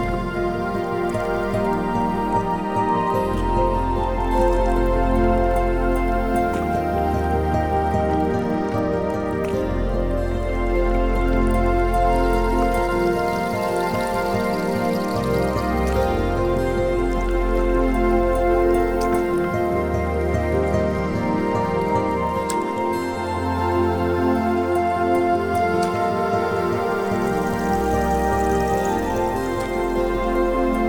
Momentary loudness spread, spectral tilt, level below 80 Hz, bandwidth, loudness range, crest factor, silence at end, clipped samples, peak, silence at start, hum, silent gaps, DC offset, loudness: 4 LU; -7 dB/octave; -28 dBFS; 18.5 kHz; 2 LU; 14 dB; 0 s; under 0.1%; -6 dBFS; 0 s; none; none; under 0.1%; -21 LUFS